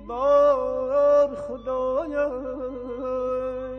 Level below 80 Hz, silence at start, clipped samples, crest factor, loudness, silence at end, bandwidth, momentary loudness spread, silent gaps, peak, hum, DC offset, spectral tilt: -48 dBFS; 0 s; under 0.1%; 14 dB; -24 LUFS; 0 s; 6.4 kHz; 13 LU; none; -10 dBFS; 50 Hz at -50 dBFS; under 0.1%; -6.5 dB/octave